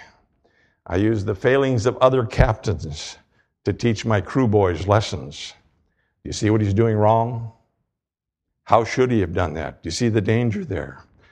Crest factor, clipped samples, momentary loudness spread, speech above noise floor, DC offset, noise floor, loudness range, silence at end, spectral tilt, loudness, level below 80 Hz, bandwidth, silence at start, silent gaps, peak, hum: 22 dB; under 0.1%; 14 LU; 66 dB; under 0.1%; -86 dBFS; 2 LU; 0.35 s; -6.5 dB/octave; -21 LUFS; -38 dBFS; 9.6 kHz; 0 s; none; 0 dBFS; none